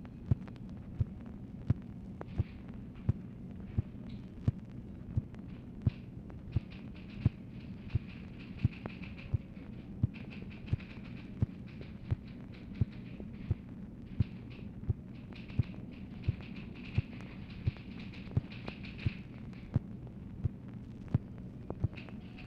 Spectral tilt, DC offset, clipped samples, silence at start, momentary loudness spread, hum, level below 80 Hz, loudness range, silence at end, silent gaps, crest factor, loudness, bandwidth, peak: -9.5 dB/octave; under 0.1%; under 0.1%; 0 s; 10 LU; none; -50 dBFS; 1 LU; 0 s; none; 24 dB; -41 LUFS; 5.8 kHz; -14 dBFS